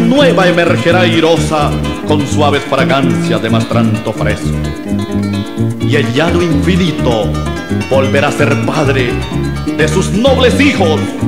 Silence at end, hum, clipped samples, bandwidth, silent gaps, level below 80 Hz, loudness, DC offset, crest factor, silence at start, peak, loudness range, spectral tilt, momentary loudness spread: 0 s; none; under 0.1%; 16 kHz; none; -28 dBFS; -12 LUFS; 2%; 12 dB; 0 s; 0 dBFS; 3 LU; -6 dB/octave; 8 LU